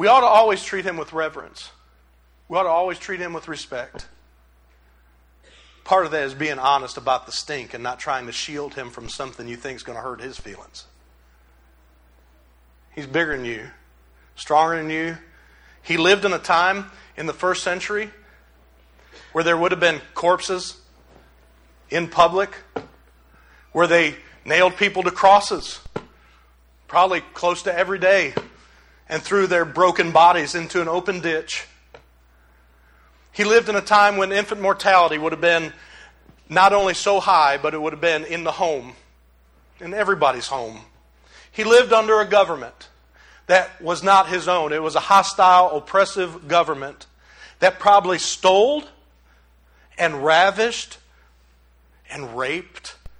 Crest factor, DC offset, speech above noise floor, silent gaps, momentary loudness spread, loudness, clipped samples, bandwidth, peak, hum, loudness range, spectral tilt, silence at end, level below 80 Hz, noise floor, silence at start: 20 dB; under 0.1%; 36 dB; none; 18 LU; -19 LUFS; under 0.1%; 12.5 kHz; 0 dBFS; none; 10 LU; -3.5 dB/octave; 0.1 s; -54 dBFS; -55 dBFS; 0 s